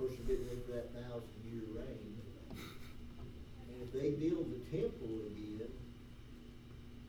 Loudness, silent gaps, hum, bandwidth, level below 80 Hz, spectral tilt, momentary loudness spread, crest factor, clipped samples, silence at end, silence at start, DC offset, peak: -44 LUFS; none; none; over 20 kHz; -54 dBFS; -7.5 dB/octave; 17 LU; 18 dB; under 0.1%; 0 s; 0 s; under 0.1%; -26 dBFS